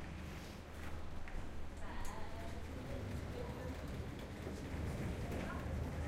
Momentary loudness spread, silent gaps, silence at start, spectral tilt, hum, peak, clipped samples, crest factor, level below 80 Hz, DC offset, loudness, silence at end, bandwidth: 7 LU; none; 0 s; -6 dB/octave; none; -30 dBFS; under 0.1%; 14 dB; -48 dBFS; under 0.1%; -47 LUFS; 0 s; 16 kHz